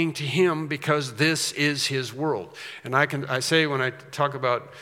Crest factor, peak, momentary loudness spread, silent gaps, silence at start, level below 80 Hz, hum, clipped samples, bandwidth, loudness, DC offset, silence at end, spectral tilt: 22 dB; -4 dBFS; 7 LU; none; 0 s; -76 dBFS; none; under 0.1%; 17 kHz; -24 LUFS; under 0.1%; 0 s; -4 dB/octave